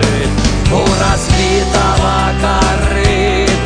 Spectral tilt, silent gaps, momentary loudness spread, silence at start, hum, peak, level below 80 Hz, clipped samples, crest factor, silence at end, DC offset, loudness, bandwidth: -5 dB/octave; none; 2 LU; 0 s; none; 0 dBFS; -18 dBFS; under 0.1%; 12 dB; 0 s; under 0.1%; -12 LUFS; 10 kHz